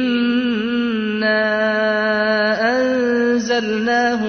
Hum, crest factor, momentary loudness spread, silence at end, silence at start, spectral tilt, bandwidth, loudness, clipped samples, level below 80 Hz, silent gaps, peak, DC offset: none; 10 dB; 3 LU; 0 s; 0 s; -4.5 dB/octave; 6.6 kHz; -17 LUFS; under 0.1%; -56 dBFS; none; -6 dBFS; under 0.1%